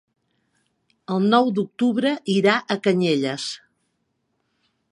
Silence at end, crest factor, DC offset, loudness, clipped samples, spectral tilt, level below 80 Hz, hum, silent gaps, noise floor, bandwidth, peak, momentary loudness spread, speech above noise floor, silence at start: 1.35 s; 20 dB; under 0.1%; -21 LUFS; under 0.1%; -5.5 dB/octave; -74 dBFS; none; none; -73 dBFS; 11 kHz; -2 dBFS; 10 LU; 52 dB; 1.1 s